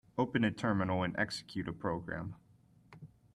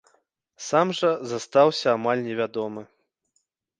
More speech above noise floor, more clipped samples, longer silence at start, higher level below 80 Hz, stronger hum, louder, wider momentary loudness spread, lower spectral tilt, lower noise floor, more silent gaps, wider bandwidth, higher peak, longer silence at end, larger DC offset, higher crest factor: second, 28 dB vs 51 dB; neither; second, 0.15 s vs 0.6 s; first, -64 dBFS vs -74 dBFS; neither; second, -35 LUFS vs -23 LUFS; first, 23 LU vs 13 LU; first, -6.5 dB/octave vs -4.5 dB/octave; second, -63 dBFS vs -74 dBFS; neither; first, 12.5 kHz vs 9.8 kHz; second, -18 dBFS vs -6 dBFS; second, 0.3 s vs 0.95 s; neither; about the same, 18 dB vs 20 dB